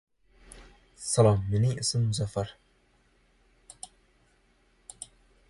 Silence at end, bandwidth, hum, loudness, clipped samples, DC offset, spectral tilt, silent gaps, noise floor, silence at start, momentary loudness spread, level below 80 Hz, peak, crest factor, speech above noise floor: 0.45 s; 11.5 kHz; none; -27 LUFS; under 0.1%; under 0.1%; -5.5 dB/octave; none; -66 dBFS; 0.55 s; 23 LU; -52 dBFS; -8 dBFS; 24 dB; 40 dB